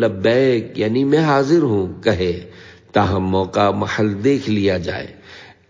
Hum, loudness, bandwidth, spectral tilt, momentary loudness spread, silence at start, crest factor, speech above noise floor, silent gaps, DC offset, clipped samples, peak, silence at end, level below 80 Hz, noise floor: none; -18 LUFS; 7.6 kHz; -7 dB/octave; 8 LU; 0 s; 16 dB; 25 dB; none; under 0.1%; under 0.1%; -2 dBFS; 0.25 s; -40 dBFS; -42 dBFS